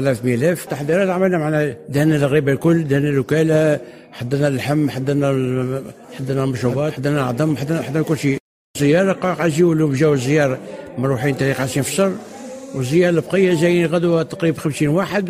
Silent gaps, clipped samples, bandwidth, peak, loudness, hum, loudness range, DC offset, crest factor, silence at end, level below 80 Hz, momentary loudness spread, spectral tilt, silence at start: 8.40-8.74 s; under 0.1%; 16 kHz; -4 dBFS; -18 LUFS; none; 3 LU; under 0.1%; 14 dB; 0 s; -52 dBFS; 9 LU; -6.5 dB/octave; 0 s